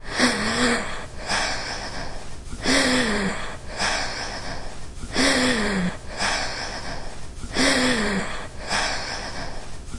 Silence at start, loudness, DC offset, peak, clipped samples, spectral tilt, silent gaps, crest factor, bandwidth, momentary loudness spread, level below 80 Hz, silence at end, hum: 0 s; -23 LUFS; under 0.1%; -6 dBFS; under 0.1%; -3 dB/octave; none; 18 dB; 11.5 kHz; 17 LU; -38 dBFS; 0 s; none